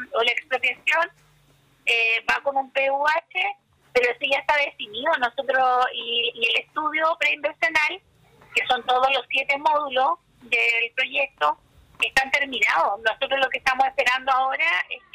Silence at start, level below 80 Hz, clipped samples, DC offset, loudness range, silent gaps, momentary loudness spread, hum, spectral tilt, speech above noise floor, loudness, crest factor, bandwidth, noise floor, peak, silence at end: 0 s; -60 dBFS; under 0.1%; under 0.1%; 1 LU; none; 5 LU; none; -1 dB/octave; 36 dB; -22 LUFS; 14 dB; 15.5 kHz; -59 dBFS; -10 dBFS; 0.15 s